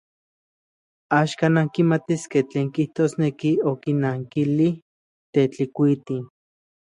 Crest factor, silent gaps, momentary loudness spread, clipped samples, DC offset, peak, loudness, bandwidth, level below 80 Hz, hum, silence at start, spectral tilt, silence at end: 18 dB; 4.82-5.33 s; 6 LU; under 0.1%; under 0.1%; -4 dBFS; -22 LUFS; 11 kHz; -66 dBFS; none; 1.1 s; -7.5 dB/octave; 0.55 s